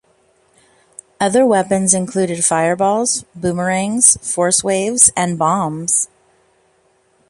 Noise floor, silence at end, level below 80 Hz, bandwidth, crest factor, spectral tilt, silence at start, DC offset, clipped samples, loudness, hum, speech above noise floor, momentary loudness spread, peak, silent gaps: -58 dBFS; 1.25 s; -54 dBFS; 16 kHz; 18 dB; -3.5 dB/octave; 1.2 s; under 0.1%; under 0.1%; -14 LUFS; none; 42 dB; 9 LU; 0 dBFS; none